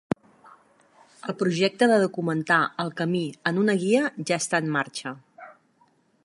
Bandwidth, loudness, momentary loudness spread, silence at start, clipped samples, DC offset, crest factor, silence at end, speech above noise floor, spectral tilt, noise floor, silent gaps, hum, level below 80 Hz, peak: 11.5 kHz; -24 LUFS; 13 LU; 1.25 s; under 0.1%; under 0.1%; 20 dB; 0.75 s; 40 dB; -5 dB/octave; -64 dBFS; none; none; -68 dBFS; -6 dBFS